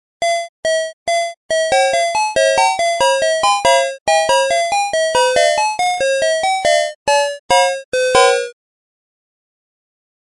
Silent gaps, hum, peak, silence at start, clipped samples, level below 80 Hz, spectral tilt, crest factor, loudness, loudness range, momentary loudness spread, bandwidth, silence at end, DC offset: 0.49-0.63 s, 0.93-1.06 s, 1.37-1.49 s, 4.01-4.06 s, 6.95-7.06 s, 7.39-7.49 s, 7.85-7.92 s; none; 0 dBFS; 0.2 s; under 0.1%; -52 dBFS; 0 dB/octave; 16 dB; -15 LUFS; 2 LU; 6 LU; 11.5 kHz; 1.75 s; under 0.1%